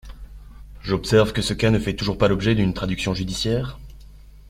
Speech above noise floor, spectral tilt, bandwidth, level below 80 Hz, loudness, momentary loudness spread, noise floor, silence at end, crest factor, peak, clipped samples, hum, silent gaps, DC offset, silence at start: 23 dB; -6 dB/octave; 15 kHz; -38 dBFS; -21 LUFS; 8 LU; -44 dBFS; 0.1 s; 20 dB; -2 dBFS; under 0.1%; 50 Hz at -35 dBFS; none; under 0.1%; 0.05 s